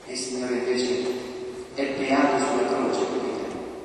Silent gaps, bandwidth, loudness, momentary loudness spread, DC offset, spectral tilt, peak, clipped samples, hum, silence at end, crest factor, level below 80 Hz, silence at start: none; 11.5 kHz; -26 LUFS; 11 LU; under 0.1%; -3.5 dB/octave; -8 dBFS; under 0.1%; none; 0 s; 18 dB; -60 dBFS; 0 s